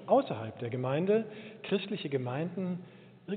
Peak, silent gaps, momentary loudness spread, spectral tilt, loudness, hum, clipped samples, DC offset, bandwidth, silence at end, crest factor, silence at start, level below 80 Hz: -14 dBFS; none; 15 LU; -6 dB/octave; -33 LUFS; none; under 0.1%; under 0.1%; 4.6 kHz; 0 s; 18 dB; 0 s; -80 dBFS